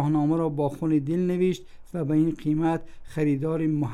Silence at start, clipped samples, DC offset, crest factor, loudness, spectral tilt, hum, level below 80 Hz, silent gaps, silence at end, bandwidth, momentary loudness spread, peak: 0 s; under 0.1%; under 0.1%; 12 dB; -26 LUFS; -9 dB/octave; none; -50 dBFS; none; 0 s; 11.5 kHz; 8 LU; -12 dBFS